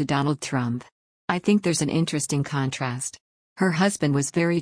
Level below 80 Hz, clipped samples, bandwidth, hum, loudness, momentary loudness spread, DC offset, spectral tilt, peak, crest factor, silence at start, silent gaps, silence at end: -60 dBFS; under 0.1%; 10.5 kHz; none; -24 LUFS; 8 LU; under 0.1%; -5 dB/octave; -8 dBFS; 18 dB; 0 s; 0.92-1.28 s, 3.21-3.56 s; 0 s